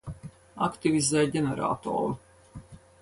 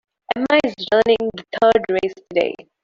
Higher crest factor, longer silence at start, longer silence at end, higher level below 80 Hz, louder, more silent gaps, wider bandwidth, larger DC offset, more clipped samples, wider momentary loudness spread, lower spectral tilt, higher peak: about the same, 18 dB vs 16 dB; second, 0.05 s vs 0.3 s; about the same, 0.25 s vs 0.3 s; about the same, -56 dBFS vs -54 dBFS; second, -27 LUFS vs -19 LUFS; neither; first, 11.5 kHz vs 7.6 kHz; neither; neither; first, 23 LU vs 8 LU; about the same, -5 dB/octave vs -5 dB/octave; second, -12 dBFS vs -2 dBFS